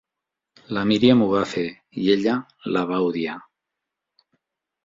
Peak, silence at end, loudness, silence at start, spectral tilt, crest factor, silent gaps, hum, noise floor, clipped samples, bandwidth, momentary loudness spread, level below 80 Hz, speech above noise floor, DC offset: -2 dBFS; 1.45 s; -22 LUFS; 0.7 s; -6.5 dB/octave; 20 dB; none; none; -85 dBFS; under 0.1%; 7.8 kHz; 14 LU; -58 dBFS; 64 dB; under 0.1%